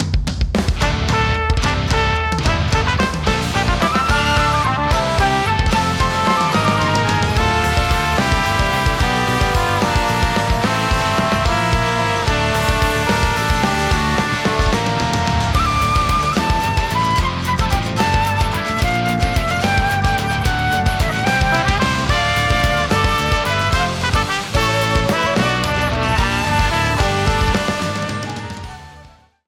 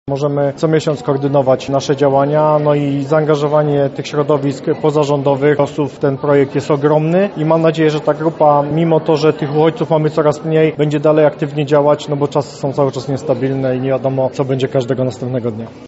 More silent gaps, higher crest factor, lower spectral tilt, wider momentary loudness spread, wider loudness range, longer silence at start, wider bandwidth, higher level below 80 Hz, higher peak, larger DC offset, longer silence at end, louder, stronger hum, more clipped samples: neither; about the same, 12 dB vs 14 dB; second, -4.5 dB/octave vs -6.5 dB/octave; about the same, 3 LU vs 5 LU; about the same, 1 LU vs 3 LU; about the same, 0 s vs 0.05 s; first, 18 kHz vs 8 kHz; first, -24 dBFS vs -52 dBFS; second, -6 dBFS vs 0 dBFS; neither; first, 0.4 s vs 0 s; second, -17 LUFS vs -14 LUFS; neither; neither